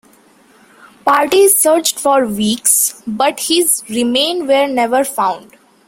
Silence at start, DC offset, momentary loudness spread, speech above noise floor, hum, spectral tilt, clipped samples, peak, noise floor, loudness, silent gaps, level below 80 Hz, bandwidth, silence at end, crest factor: 1.05 s; under 0.1%; 7 LU; 35 dB; none; -2 dB/octave; under 0.1%; 0 dBFS; -48 dBFS; -13 LUFS; none; -56 dBFS; 16.5 kHz; 0.45 s; 14 dB